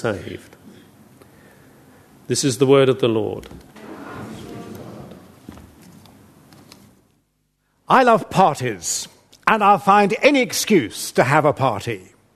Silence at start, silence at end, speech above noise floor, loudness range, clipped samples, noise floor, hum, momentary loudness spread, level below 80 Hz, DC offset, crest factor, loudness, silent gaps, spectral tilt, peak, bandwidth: 0 s; 0.35 s; 50 dB; 21 LU; under 0.1%; -68 dBFS; none; 22 LU; -56 dBFS; under 0.1%; 20 dB; -17 LUFS; none; -4.5 dB/octave; 0 dBFS; 13.5 kHz